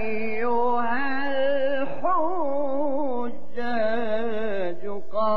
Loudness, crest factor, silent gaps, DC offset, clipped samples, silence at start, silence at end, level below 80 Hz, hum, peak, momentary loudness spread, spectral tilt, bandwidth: -26 LUFS; 12 dB; none; 7%; under 0.1%; 0 s; 0 s; -62 dBFS; none; -12 dBFS; 7 LU; -7 dB/octave; 6.8 kHz